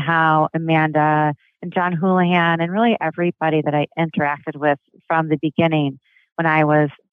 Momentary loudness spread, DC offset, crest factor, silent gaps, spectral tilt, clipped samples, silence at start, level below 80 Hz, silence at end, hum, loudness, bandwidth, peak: 7 LU; under 0.1%; 16 dB; 6.32-6.36 s; -9.5 dB/octave; under 0.1%; 0 s; -66 dBFS; 0.2 s; none; -19 LUFS; 4.1 kHz; -2 dBFS